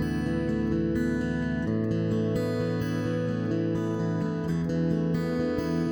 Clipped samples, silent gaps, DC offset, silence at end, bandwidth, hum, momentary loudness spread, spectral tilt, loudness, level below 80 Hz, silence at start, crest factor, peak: under 0.1%; none; under 0.1%; 0 s; over 20 kHz; none; 2 LU; -8 dB/octave; -28 LUFS; -46 dBFS; 0 s; 12 dB; -14 dBFS